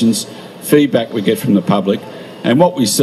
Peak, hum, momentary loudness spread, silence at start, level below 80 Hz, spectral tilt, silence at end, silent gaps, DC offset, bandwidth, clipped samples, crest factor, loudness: 0 dBFS; none; 12 LU; 0 s; -60 dBFS; -5 dB/octave; 0 s; none; under 0.1%; 14.5 kHz; under 0.1%; 14 dB; -14 LUFS